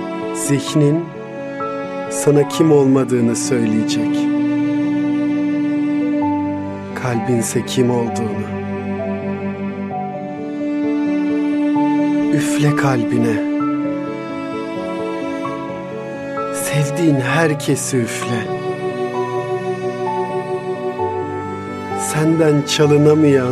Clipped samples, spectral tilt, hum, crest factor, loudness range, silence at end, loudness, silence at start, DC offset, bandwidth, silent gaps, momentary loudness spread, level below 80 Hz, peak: under 0.1%; -6 dB/octave; none; 16 dB; 6 LU; 0 s; -18 LUFS; 0 s; under 0.1%; 14.5 kHz; none; 10 LU; -58 dBFS; -2 dBFS